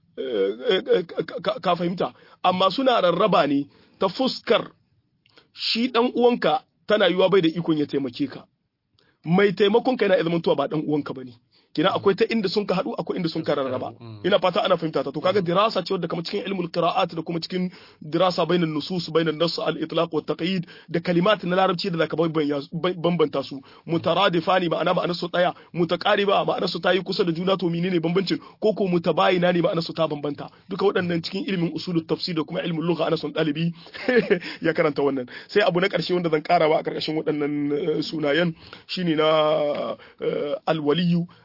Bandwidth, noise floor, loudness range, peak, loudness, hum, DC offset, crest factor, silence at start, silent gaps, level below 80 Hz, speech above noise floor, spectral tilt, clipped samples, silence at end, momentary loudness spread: 5.8 kHz; -68 dBFS; 2 LU; -6 dBFS; -23 LUFS; none; under 0.1%; 16 dB; 0.15 s; none; -66 dBFS; 45 dB; -7 dB/octave; under 0.1%; 0.15 s; 9 LU